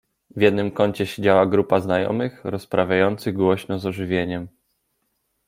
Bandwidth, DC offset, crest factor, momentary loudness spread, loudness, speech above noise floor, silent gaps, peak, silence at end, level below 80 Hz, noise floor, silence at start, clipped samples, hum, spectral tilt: 16 kHz; under 0.1%; 20 dB; 10 LU; -21 LUFS; 52 dB; none; -2 dBFS; 1 s; -58 dBFS; -72 dBFS; 0.35 s; under 0.1%; none; -7 dB/octave